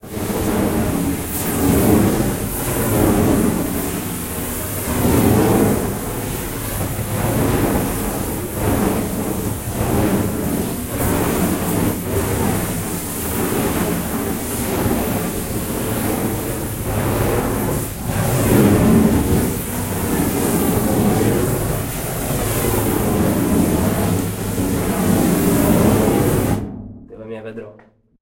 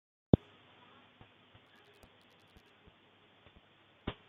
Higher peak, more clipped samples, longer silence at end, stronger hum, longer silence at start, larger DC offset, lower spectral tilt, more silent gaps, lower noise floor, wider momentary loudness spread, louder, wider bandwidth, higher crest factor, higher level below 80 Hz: first, -2 dBFS vs -6 dBFS; neither; first, 0.5 s vs 0.2 s; neither; second, 0.05 s vs 4.05 s; neither; second, -5.5 dB/octave vs -10 dB/octave; neither; second, -48 dBFS vs -65 dBFS; second, 9 LU vs 30 LU; first, -18 LUFS vs -33 LUFS; first, 16.5 kHz vs 5 kHz; second, 16 dB vs 34 dB; first, -32 dBFS vs -54 dBFS